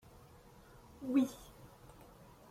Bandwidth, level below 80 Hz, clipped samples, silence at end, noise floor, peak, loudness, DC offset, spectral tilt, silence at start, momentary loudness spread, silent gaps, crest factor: 16 kHz; -66 dBFS; under 0.1%; 0.85 s; -60 dBFS; -20 dBFS; -36 LUFS; under 0.1%; -6 dB/octave; 1 s; 26 LU; none; 20 dB